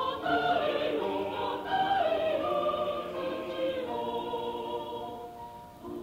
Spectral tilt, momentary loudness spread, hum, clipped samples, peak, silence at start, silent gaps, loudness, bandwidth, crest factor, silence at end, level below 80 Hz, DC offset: -5.5 dB/octave; 14 LU; none; under 0.1%; -16 dBFS; 0 s; none; -31 LUFS; 16 kHz; 16 dB; 0 s; -62 dBFS; under 0.1%